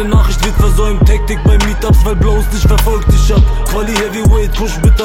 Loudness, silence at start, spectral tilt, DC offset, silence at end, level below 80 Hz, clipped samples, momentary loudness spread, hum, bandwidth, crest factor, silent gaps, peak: -12 LUFS; 0 s; -6 dB/octave; under 0.1%; 0 s; -10 dBFS; under 0.1%; 3 LU; none; 16.5 kHz; 10 dB; none; 0 dBFS